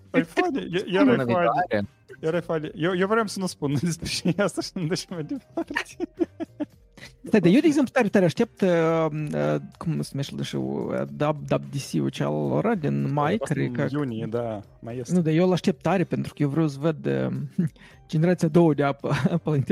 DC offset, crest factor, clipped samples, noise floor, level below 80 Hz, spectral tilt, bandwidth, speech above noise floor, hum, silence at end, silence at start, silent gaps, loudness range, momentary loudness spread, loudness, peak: under 0.1%; 18 dB; under 0.1%; -48 dBFS; -56 dBFS; -6.5 dB/octave; 15 kHz; 24 dB; none; 0 s; 0.15 s; none; 5 LU; 10 LU; -25 LUFS; -6 dBFS